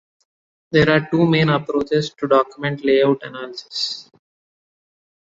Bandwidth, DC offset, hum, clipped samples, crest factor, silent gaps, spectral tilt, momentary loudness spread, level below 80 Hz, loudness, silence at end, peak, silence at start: 7.8 kHz; under 0.1%; none; under 0.1%; 18 dB; none; -6.5 dB/octave; 11 LU; -52 dBFS; -18 LUFS; 1.35 s; -2 dBFS; 0.7 s